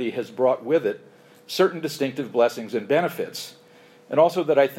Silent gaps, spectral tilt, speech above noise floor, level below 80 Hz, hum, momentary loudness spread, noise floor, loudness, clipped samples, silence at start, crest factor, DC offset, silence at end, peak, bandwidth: none; -5 dB/octave; 29 dB; -80 dBFS; none; 12 LU; -52 dBFS; -23 LUFS; under 0.1%; 0 s; 18 dB; under 0.1%; 0 s; -6 dBFS; 16.5 kHz